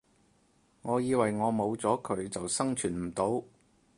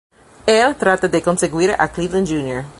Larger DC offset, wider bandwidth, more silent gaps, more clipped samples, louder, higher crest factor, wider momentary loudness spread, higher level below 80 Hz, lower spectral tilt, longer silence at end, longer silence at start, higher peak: neither; about the same, 11.5 kHz vs 11.5 kHz; neither; neither; second, -31 LUFS vs -17 LUFS; about the same, 20 dB vs 16 dB; about the same, 6 LU vs 6 LU; second, -62 dBFS vs -44 dBFS; about the same, -5 dB/octave vs -4.5 dB/octave; first, 0.5 s vs 0.05 s; first, 0.85 s vs 0.45 s; second, -12 dBFS vs 0 dBFS